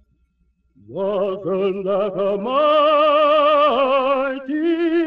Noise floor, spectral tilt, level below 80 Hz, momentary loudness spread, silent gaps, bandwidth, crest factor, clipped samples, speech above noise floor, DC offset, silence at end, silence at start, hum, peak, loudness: -64 dBFS; -7.5 dB/octave; -60 dBFS; 8 LU; none; 5.4 kHz; 12 dB; under 0.1%; 46 dB; 0.1%; 0 s; 0.9 s; none; -6 dBFS; -18 LUFS